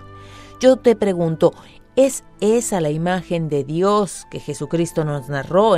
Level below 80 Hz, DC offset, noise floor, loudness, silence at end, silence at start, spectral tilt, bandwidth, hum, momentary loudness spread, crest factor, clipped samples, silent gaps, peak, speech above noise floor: -48 dBFS; under 0.1%; -39 dBFS; -19 LUFS; 0 s; 0 s; -5.5 dB/octave; 15.5 kHz; none; 8 LU; 18 dB; under 0.1%; none; -2 dBFS; 21 dB